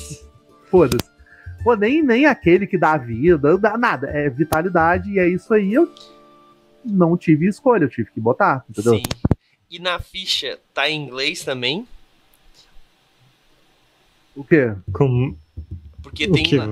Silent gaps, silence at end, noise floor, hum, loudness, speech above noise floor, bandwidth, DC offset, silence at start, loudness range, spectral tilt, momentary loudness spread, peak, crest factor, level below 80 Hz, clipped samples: none; 0 s; -58 dBFS; none; -18 LUFS; 40 dB; 16 kHz; under 0.1%; 0 s; 8 LU; -6 dB/octave; 11 LU; 0 dBFS; 18 dB; -42 dBFS; under 0.1%